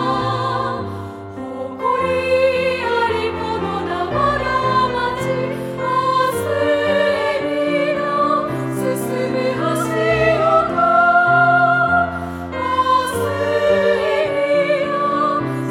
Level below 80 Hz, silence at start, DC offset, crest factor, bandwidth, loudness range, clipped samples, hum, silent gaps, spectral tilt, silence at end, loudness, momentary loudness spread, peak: -44 dBFS; 0 s; under 0.1%; 14 dB; 17 kHz; 4 LU; under 0.1%; none; none; -5.5 dB/octave; 0 s; -17 LUFS; 9 LU; -4 dBFS